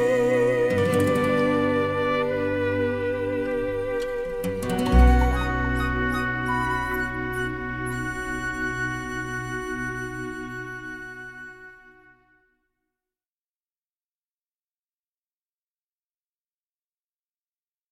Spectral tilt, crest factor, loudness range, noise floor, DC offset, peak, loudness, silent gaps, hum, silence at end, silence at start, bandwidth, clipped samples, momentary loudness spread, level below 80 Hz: -6.5 dB/octave; 20 dB; 14 LU; under -90 dBFS; under 0.1%; -6 dBFS; -25 LUFS; none; none; 6 s; 0 s; 15.5 kHz; under 0.1%; 13 LU; -32 dBFS